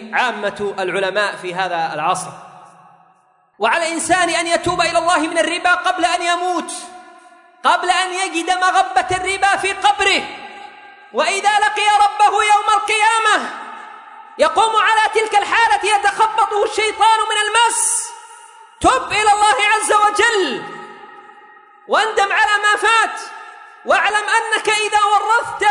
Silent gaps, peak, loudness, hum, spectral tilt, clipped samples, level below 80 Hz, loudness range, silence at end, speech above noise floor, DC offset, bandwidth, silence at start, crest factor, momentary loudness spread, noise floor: none; -2 dBFS; -15 LUFS; none; -1 dB/octave; under 0.1%; -52 dBFS; 4 LU; 0 s; 40 dB; under 0.1%; 11 kHz; 0 s; 16 dB; 13 LU; -55 dBFS